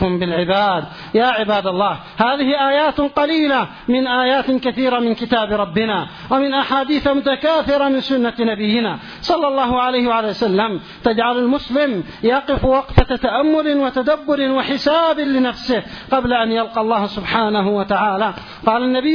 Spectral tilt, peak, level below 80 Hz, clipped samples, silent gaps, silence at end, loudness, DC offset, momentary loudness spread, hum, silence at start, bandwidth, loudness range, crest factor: -7 dB/octave; 0 dBFS; -34 dBFS; under 0.1%; none; 0 s; -17 LUFS; under 0.1%; 4 LU; none; 0 s; 5.4 kHz; 1 LU; 16 dB